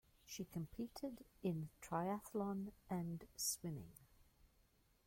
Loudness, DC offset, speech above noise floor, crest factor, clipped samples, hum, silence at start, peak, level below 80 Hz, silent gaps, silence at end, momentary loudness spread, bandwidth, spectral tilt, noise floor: -46 LUFS; under 0.1%; 30 dB; 18 dB; under 0.1%; none; 0.25 s; -30 dBFS; -70 dBFS; none; 0.6 s; 9 LU; 16.5 kHz; -5 dB/octave; -76 dBFS